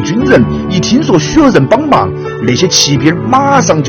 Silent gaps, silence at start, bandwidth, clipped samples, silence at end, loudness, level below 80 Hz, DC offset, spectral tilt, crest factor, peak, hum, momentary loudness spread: none; 0 s; 18.5 kHz; 1%; 0 s; -9 LUFS; -32 dBFS; under 0.1%; -4.5 dB/octave; 8 dB; 0 dBFS; none; 5 LU